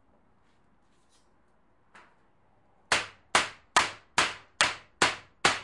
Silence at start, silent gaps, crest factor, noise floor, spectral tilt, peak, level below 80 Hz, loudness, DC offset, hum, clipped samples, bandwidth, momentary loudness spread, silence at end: 2.9 s; none; 28 dB; -68 dBFS; -0.5 dB/octave; -4 dBFS; -64 dBFS; -28 LUFS; under 0.1%; none; under 0.1%; 11.5 kHz; 2 LU; 0 s